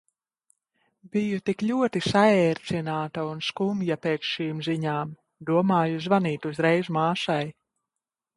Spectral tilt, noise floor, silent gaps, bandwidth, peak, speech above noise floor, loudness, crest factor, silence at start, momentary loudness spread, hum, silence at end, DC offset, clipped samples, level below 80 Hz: -6.5 dB/octave; -88 dBFS; none; 11.5 kHz; -6 dBFS; 63 dB; -25 LUFS; 20 dB; 1.05 s; 9 LU; none; 0.85 s; under 0.1%; under 0.1%; -64 dBFS